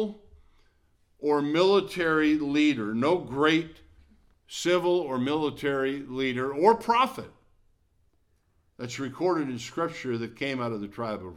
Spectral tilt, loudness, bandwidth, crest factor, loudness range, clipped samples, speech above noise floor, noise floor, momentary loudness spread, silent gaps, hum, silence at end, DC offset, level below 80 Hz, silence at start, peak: -5.5 dB/octave; -26 LUFS; 14.5 kHz; 20 dB; 7 LU; under 0.1%; 42 dB; -68 dBFS; 11 LU; none; none; 0 s; under 0.1%; -62 dBFS; 0 s; -8 dBFS